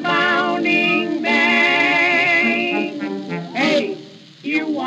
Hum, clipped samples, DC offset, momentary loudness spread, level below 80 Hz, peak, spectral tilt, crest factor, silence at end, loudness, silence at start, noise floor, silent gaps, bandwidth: none; under 0.1%; under 0.1%; 13 LU; -76 dBFS; -6 dBFS; -4.5 dB/octave; 12 dB; 0 s; -16 LUFS; 0 s; -39 dBFS; none; 14 kHz